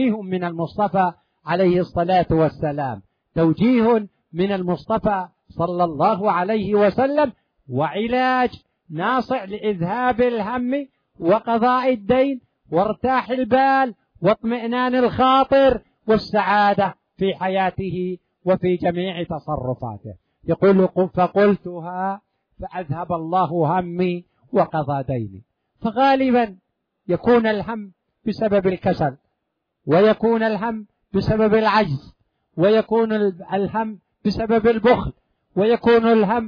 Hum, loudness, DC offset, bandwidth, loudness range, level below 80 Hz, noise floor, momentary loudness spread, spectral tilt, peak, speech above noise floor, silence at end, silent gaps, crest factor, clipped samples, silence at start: none; -20 LUFS; under 0.1%; 5.4 kHz; 4 LU; -48 dBFS; -76 dBFS; 12 LU; -8.5 dB/octave; -4 dBFS; 57 dB; 0 s; none; 16 dB; under 0.1%; 0 s